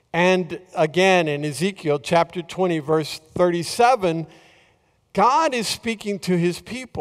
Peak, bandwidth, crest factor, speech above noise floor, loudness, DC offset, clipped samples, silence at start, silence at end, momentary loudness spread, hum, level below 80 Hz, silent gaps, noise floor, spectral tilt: -4 dBFS; 15.5 kHz; 16 dB; 41 dB; -21 LUFS; under 0.1%; under 0.1%; 0.15 s; 0 s; 12 LU; none; -58 dBFS; none; -61 dBFS; -5 dB/octave